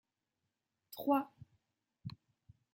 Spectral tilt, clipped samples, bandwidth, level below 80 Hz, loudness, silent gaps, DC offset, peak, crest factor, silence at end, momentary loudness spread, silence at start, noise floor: -7 dB/octave; under 0.1%; 16.5 kHz; -78 dBFS; -36 LUFS; none; under 0.1%; -20 dBFS; 24 dB; 0.6 s; 18 LU; 0.9 s; -88 dBFS